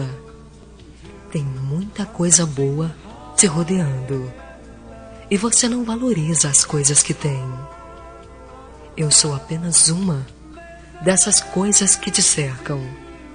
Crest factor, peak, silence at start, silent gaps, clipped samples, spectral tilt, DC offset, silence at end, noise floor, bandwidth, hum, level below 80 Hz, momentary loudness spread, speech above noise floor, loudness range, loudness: 20 dB; 0 dBFS; 0 s; none; under 0.1%; -3 dB/octave; under 0.1%; 0 s; -42 dBFS; 10 kHz; none; -44 dBFS; 17 LU; 24 dB; 4 LU; -17 LUFS